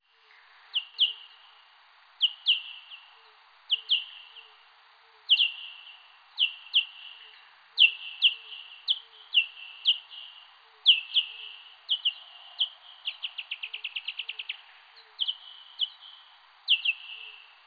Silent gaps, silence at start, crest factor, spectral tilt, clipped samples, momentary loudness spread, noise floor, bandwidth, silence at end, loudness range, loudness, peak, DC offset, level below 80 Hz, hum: none; 0.75 s; 24 dB; 4.5 dB/octave; under 0.1%; 24 LU; -59 dBFS; 5 kHz; 0.3 s; 8 LU; -26 LUFS; -8 dBFS; under 0.1%; under -90 dBFS; none